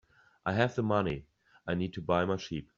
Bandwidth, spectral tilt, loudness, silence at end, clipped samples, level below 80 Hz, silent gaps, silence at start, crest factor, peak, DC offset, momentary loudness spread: 7.4 kHz; -5.5 dB/octave; -32 LUFS; 0.15 s; under 0.1%; -58 dBFS; none; 0.45 s; 22 dB; -10 dBFS; under 0.1%; 9 LU